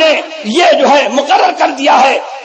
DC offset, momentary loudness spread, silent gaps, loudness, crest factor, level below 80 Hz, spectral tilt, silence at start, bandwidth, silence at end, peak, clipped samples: under 0.1%; 4 LU; none; -9 LUFS; 10 dB; -72 dBFS; -2.5 dB/octave; 0 s; 9 kHz; 0 s; 0 dBFS; under 0.1%